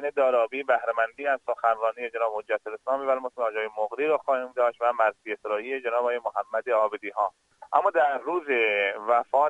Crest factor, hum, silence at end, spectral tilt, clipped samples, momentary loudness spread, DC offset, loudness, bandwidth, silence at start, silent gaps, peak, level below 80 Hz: 20 dB; none; 0 s; -4 dB/octave; under 0.1%; 6 LU; under 0.1%; -26 LUFS; 9 kHz; 0 s; none; -6 dBFS; -78 dBFS